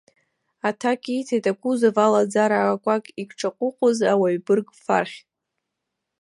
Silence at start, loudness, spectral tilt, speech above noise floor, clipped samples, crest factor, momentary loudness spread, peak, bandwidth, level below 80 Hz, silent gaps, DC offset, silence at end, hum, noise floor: 0.65 s; -22 LUFS; -5.5 dB/octave; 60 dB; under 0.1%; 18 dB; 9 LU; -4 dBFS; 11.5 kHz; -76 dBFS; none; under 0.1%; 1.05 s; none; -81 dBFS